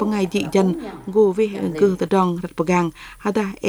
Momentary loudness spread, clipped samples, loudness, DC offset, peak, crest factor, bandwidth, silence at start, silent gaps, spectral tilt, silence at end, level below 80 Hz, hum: 7 LU; under 0.1%; -20 LUFS; under 0.1%; -4 dBFS; 16 dB; over 20 kHz; 0 s; none; -6.5 dB/octave; 0 s; -50 dBFS; none